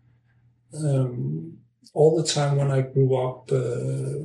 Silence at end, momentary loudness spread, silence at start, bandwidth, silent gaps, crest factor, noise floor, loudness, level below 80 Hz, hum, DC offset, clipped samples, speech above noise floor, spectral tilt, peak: 0 s; 13 LU; 0.7 s; 11 kHz; none; 18 dB; -61 dBFS; -24 LUFS; -64 dBFS; none; under 0.1%; under 0.1%; 38 dB; -6.5 dB/octave; -6 dBFS